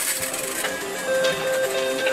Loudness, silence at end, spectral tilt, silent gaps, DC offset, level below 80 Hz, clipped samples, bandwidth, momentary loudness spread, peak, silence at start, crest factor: -23 LUFS; 0 s; -1 dB/octave; none; under 0.1%; -60 dBFS; under 0.1%; 16 kHz; 4 LU; -8 dBFS; 0 s; 16 dB